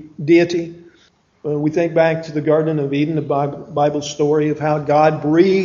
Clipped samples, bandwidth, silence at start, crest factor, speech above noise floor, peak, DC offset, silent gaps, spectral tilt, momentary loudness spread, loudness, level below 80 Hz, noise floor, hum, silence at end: under 0.1%; 7.4 kHz; 0 s; 16 dB; 39 dB; 0 dBFS; under 0.1%; none; -7 dB/octave; 7 LU; -17 LUFS; -56 dBFS; -55 dBFS; none; 0 s